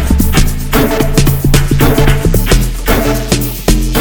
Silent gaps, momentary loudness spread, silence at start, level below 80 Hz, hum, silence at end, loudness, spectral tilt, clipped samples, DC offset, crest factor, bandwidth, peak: none; 4 LU; 0 s; -12 dBFS; none; 0 s; -12 LUFS; -5 dB/octave; 0.2%; under 0.1%; 10 dB; 19.5 kHz; 0 dBFS